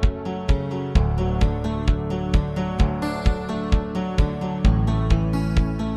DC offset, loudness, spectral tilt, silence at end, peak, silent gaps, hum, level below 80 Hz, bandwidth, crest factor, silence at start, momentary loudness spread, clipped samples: under 0.1%; -23 LUFS; -7.5 dB/octave; 0 s; -4 dBFS; none; none; -24 dBFS; 10.5 kHz; 16 dB; 0 s; 4 LU; under 0.1%